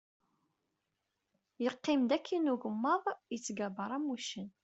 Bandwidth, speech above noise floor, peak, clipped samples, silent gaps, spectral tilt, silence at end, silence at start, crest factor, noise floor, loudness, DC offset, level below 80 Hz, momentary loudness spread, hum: 8.2 kHz; 50 dB; -18 dBFS; under 0.1%; none; -4.5 dB/octave; 0.15 s; 1.6 s; 18 dB; -85 dBFS; -35 LUFS; under 0.1%; -82 dBFS; 8 LU; none